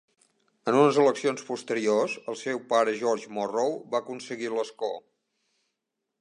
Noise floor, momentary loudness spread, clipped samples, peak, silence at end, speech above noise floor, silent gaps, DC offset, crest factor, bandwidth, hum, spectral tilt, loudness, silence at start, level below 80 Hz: -83 dBFS; 13 LU; under 0.1%; -8 dBFS; 1.2 s; 57 dB; none; under 0.1%; 20 dB; 10.5 kHz; none; -4.5 dB/octave; -27 LUFS; 0.65 s; -82 dBFS